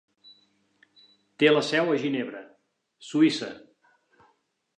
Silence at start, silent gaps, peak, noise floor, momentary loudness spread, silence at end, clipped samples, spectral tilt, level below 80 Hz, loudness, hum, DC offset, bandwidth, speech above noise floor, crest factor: 1.4 s; none; -8 dBFS; -71 dBFS; 22 LU; 1.2 s; under 0.1%; -5 dB/octave; -82 dBFS; -24 LUFS; none; under 0.1%; 9.8 kHz; 47 dB; 20 dB